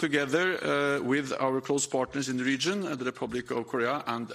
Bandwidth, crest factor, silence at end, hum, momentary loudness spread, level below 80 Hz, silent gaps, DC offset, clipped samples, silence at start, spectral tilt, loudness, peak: 15 kHz; 16 dB; 0 s; none; 6 LU; -66 dBFS; none; under 0.1%; under 0.1%; 0 s; -4 dB/octave; -29 LUFS; -12 dBFS